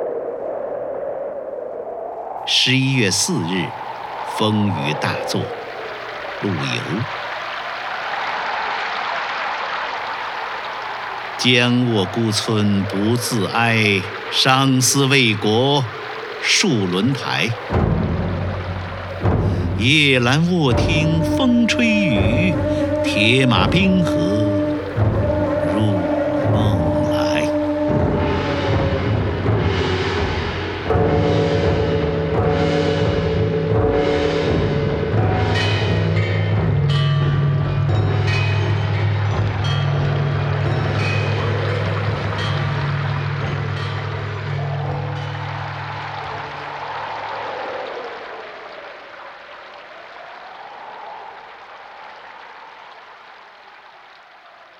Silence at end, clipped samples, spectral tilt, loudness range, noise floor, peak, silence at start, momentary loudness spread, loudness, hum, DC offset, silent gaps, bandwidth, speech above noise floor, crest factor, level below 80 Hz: 0.15 s; under 0.1%; -5 dB/octave; 13 LU; -44 dBFS; 0 dBFS; 0 s; 14 LU; -19 LUFS; none; under 0.1%; none; 14 kHz; 28 dB; 20 dB; -36 dBFS